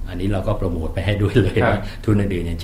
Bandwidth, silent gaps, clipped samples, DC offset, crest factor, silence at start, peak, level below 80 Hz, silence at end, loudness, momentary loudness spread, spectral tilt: 13.5 kHz; none; under 0.1%; under 0.1%; 16 dB; 0 s; -2 dBFS; -28 dBFS; 0 s; -20 LUFS; 6 LU; -7.5 dB/octave